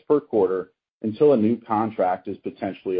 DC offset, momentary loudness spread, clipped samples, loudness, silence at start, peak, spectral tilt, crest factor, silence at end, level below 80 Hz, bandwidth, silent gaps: under 0.1%; 13 LU; under 0.1%; -23 LUFS; 0.1 s; -6 dBFS; -12 dB/octave; 16 dB; 0 s; -64 dBFS; 4.9 kHz; 0.91-1.01 s